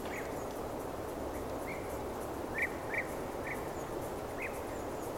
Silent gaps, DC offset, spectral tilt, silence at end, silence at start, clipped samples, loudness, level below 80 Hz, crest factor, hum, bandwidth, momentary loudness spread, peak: none; under 0.1%; -5 dB/octave; 0 s; 0 s; under 0.1%; -39 LUFS; -52 dBFS; 16 dB; none; 17 kHz; 5 LU; -22 dBFS